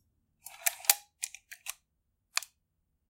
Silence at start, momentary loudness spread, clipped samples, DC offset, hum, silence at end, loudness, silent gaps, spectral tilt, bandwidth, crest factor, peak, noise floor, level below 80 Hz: 0.45 s; 23 LU; under 0.1%; under 0.1%; none; 0.7 s; -31 LUFS; none; 4.5 dB/octave; 17 kHz; 36 dB; -2 dBFS; -80 dBFS; -80 dBFS